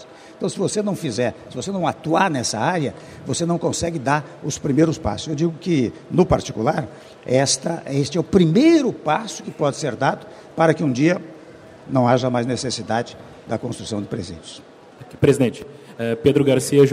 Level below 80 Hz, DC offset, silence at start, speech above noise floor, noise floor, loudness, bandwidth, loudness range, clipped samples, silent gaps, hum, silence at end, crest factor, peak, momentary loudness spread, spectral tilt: -48 dBFS; under 0.1%; 0 s; 22 dB; -42 dBFS; -20 LUFS; 15 kHz; 5 LU; under 0.1%; none; none; 0 s; 20 dB; 0 dBFS; 13 LU; -5.5 dB/octave